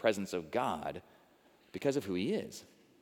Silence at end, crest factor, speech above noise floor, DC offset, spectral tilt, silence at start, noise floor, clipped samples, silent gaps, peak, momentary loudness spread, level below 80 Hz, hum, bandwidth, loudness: 0.35 s; 22 dB; 30 dB; under 0.1%; -5 dB/octave; 0 s; -65 dBFS; under 0.1%; none; -16 dBFS; 15 LU; -74 dBFS; none; 19.5 kHz; -36 LUFS